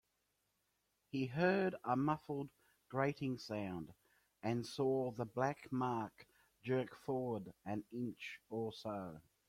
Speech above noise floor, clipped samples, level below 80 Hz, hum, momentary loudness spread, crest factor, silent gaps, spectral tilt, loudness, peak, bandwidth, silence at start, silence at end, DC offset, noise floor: 44 dB; under 0.1%; -76 dBFS; none; 10 LU; 20 dB; none; -7 dB/octave; -41 LUFS; -22 dBFS; 16 kHz; 1.15 s; 0.25 s; under 0.1%; -84 dBFS